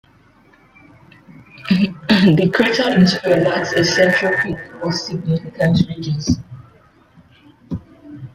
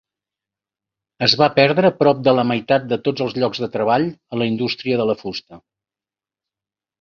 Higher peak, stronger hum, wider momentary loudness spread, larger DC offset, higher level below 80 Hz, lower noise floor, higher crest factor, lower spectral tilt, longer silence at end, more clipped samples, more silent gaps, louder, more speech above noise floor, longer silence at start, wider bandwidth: about the same, -2 dBFS vs 0 dBFS; neither; first, 14 LU vs 9 LU; neither; first, -48 dBFS vs -60 dBFS; second, -51 dBFS vs under -90 dBFS; about the same, 16 dB vs 20 dB; about the same, -5.5 dB/octave vs -6 dB/octave; second, 0.05 s vs 1.45 s; neither; neither; about the same, -16 LUFS vs -18 LUFS; second, 35 dB vs over 72 dB; first, 1.6 s vs 1.2 s; first, 13 kHz vs 7 kHz